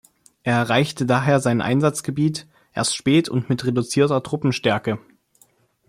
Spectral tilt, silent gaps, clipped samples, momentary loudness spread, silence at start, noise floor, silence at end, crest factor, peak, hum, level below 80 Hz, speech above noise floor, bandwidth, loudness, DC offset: -5.5 dB/octave; none; under 0.1%; 7 LU; 0.45 s; -59 dBFS; 0.9 s; 16 dB; -4 dBFS; none; -58 dBFS; 39 dB; 15.5 kHz; -21 LUFS; under 0.1%